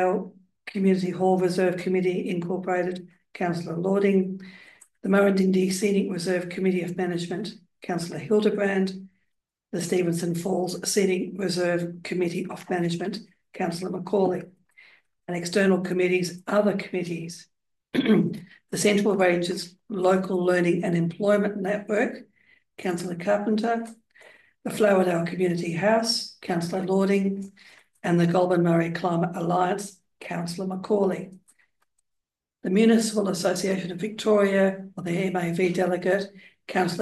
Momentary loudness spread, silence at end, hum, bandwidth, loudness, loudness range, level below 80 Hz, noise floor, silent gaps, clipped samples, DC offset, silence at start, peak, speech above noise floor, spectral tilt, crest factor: 13 LU; 0 s; none; 12.5 kHz; -25 LUFS; 4 LU; -72 dBFS; -83 dBFS; none; under 0.1%; under 0.1%; 0 s; -8 dBFS; 59 dB; -5.5 dB/octave; 18 dB